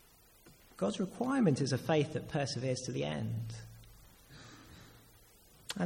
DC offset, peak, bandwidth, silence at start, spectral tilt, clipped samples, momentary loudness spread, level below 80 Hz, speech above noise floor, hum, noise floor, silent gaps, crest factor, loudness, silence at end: under 0.1%; -18 dBFS; 17 kHz; 0.45 s; -6 dB/octave; under 0.1%; 25 LU; -64 dBFS; 28 dB; none; -62 dBFS; none; 20 dB; -35 LUFS; 0 s